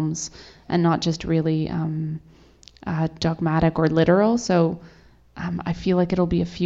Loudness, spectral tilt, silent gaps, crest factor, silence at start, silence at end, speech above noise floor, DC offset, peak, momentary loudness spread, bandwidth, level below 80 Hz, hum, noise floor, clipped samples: -22 LUFS; -6.5 dB/octave; none; 18 dB; 0 s; 0 s; 27 dB; under 0.1%; -4 dBFS; 12 LU; 7.8 kHz; -44 dBFS; none; -49 dBFS; under 0.1%